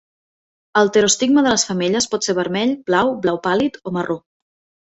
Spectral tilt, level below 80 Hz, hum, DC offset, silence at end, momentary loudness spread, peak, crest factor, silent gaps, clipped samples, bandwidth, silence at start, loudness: -3.5 dB/octave; -56 dBFS; none; under 0.1%; 0.8 s; 9 LU; -2 dBFS; 16 dB; none; under 0.1%; 8.2 kHz; 0.75 s; -18 LUFS